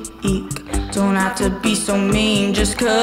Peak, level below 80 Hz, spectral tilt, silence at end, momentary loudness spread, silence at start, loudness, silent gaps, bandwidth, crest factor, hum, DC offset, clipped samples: -4 dBFS; -30 dBFS; -4 dB/octave; 0 s; 7 LU; 0 s; -18 LUFS; none; 16 kHz; 14 dB; none; under 0.1%; under 0.1%